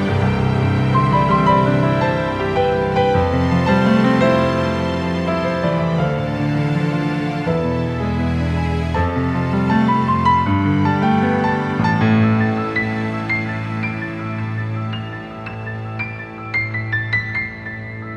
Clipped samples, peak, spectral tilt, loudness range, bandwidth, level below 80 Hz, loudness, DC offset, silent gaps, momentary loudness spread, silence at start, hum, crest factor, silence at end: under 0.1%; -2 dBFS; -8 dB/octave; 7 LU; 10 kHz; -36 dBFS; -18 LUFS; under 0.1%; none; 10 LU; 0 s; none; 16 dB; 0 s